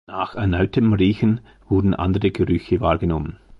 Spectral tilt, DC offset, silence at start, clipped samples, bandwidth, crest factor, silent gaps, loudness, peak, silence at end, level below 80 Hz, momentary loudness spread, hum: -9.5 dB/octave; under 0.1%; 0.1 s; under 0.1%; 5.8 kHz; 16 dB; none; -20 LUFS; -4 dBFS; 0.25 s; -34 dBFS; 6 LU; none